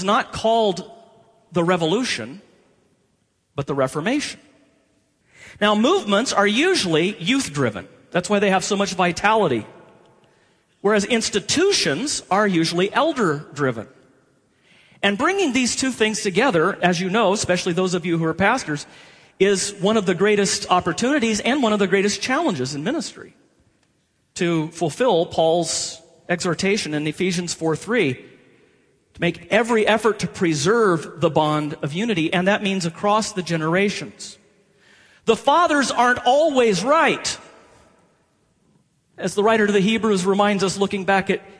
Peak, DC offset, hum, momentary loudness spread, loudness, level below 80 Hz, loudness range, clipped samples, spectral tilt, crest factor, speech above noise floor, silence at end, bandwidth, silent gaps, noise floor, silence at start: -2 dBFS; under 0.1%; none; 8 LU; -20 LUFS; -56 dBFS; 4 LU; under 0.1%; -4 dB/octave; 18 dB; 47 dB; 0.1 s; 11 kHz; none; -66 dBFS; 0 s